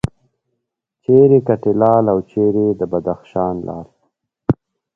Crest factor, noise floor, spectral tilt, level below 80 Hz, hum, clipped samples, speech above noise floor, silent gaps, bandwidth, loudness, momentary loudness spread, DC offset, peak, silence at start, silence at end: 16 dB; -76 dBFS; -10.5 dB/octave; -46 dBFS; none; under 0.1%; 62 dB; none; 5.4 kHz; -16 LUFS; 15 LU; under 0.1%; 0 dBFS; 1.1 s; 0.4 s